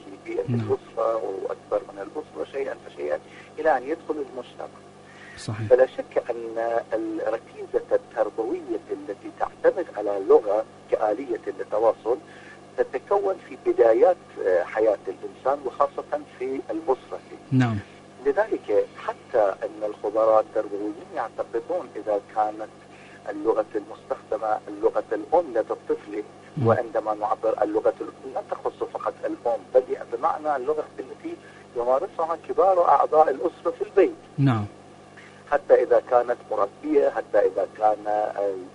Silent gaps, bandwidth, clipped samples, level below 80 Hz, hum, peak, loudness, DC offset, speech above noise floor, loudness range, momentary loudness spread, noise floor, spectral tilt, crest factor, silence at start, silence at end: none; 10.5 kHz; under 0.1%; -62 dBFS; 50 Hz at -60 dBFS; -4 dBFS; -25 LUFS; under 0.1%; 22 dB; 6 LU; 14 LU; -47 dBFS; -7.5 dB/octave; 20 dB; 0.05 s; 0.05 s